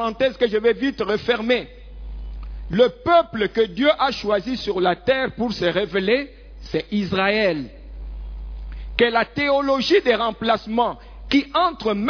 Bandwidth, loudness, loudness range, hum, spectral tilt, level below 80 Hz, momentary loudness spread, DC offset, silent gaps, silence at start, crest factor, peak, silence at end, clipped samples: 5.4 kHz; -20 LUFS; 3 LU; none; -6 dB/octave; -38 dBFS; 18 LU; under 0.1%; none; 0 s; 20 dB; -2 dBFS; 0 s; under 0.1%